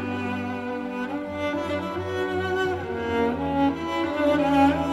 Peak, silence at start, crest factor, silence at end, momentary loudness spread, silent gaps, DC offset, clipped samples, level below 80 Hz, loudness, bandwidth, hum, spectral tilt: -8 dBFS; 0 s; 16 dB; 0 s; 10 LU; none; under 0.1%; under 0.1%; -52 dBFS; -25 LUFS; 12.5 kHz; none; -6.5 dB/octave